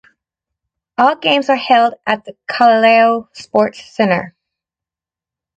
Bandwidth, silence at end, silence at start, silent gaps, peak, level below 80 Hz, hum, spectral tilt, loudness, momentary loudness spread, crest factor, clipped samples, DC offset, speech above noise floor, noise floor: 8.6 kHz; 1.25 s; 1 s; none; 0 dBFS; -62 dBFS; none; -5 dB/octave; -14 LUFS; 11 LU; 16 dB; under 0.1%; under 0.1%; 75 dB; -89 dBFS